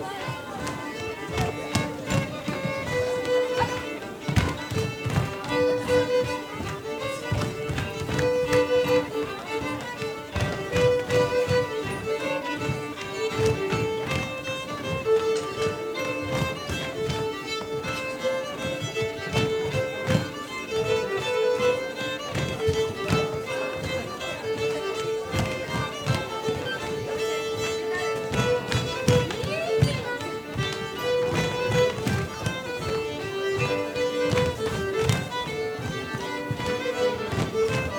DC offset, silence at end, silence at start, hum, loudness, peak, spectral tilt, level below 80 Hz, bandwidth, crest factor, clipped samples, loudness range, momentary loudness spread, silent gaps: under 0.1%; 0 s; 0 s; none; -27 LUFS; -4 dBFS; -5 dB/octave; -46 dBFS; 19.5 kHz; 22 dB; under 0.1%; 3 LU; 8 LU; none